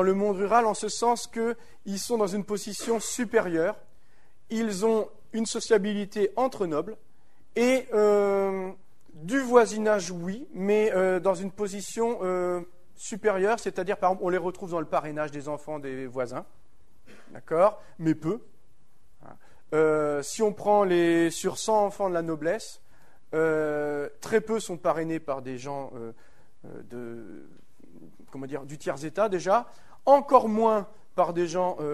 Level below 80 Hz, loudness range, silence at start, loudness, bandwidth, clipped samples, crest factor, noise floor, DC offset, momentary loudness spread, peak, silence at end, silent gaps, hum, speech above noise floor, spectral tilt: -62 dBFS; 7 LU; 0 s; -27 LUFS; 13 kHz; under 0.1%; 24 dB; -65 dBFS; 0.7%; 14 LU; -4 dBFS; 0 s; none; none; 39 dB; -5 dB/octave